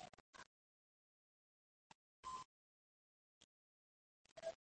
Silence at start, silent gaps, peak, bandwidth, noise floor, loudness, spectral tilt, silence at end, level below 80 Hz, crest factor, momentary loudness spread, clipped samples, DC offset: 0 s; 0.20-0.33 s, 0.46-2.23 s, 2.45-4.25 s, 4.32-4.36 s; -38 dBFS; 8.4 kHz; under -90 dBFS; -57 LUFS; -2.5 dB/octave; 0.1 s; -86 dBFS; 22 dB; 12 LU; under 0.1%; under 0.1%